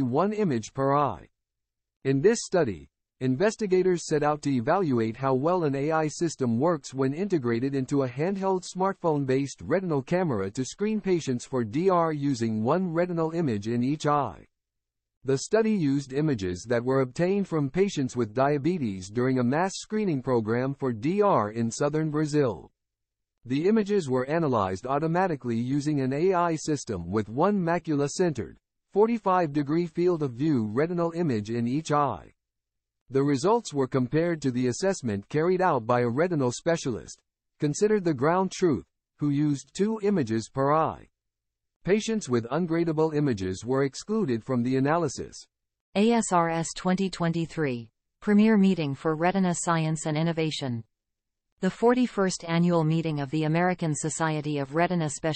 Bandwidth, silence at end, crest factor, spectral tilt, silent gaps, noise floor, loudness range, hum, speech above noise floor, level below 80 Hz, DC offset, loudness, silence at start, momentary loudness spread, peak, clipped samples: 8.8 kHz; 0 s; 16 dB; -6 dB/octave; 15.17-15.21 s, 33.01-33.06 s, 41.76-41.80 s, 45.81-45.92 s, 51.52-51.57 s; -85 dBFS; 2 LU; none; 60 dB; -60 dBFS; under 0.1%; -26 LUFS; 0 s; 6 LU; -10 dBFS; under 0.1%